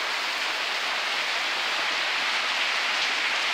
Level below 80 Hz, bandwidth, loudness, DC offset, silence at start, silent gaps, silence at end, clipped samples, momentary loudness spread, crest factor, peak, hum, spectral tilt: -80 dBFS; 16 kHz; -24 LUFS; under 0.1%; 0 s; none; 0 s; under 0.1%; 2 LU; 14 dB; -12 dBFS; none; 1.5 dB/octave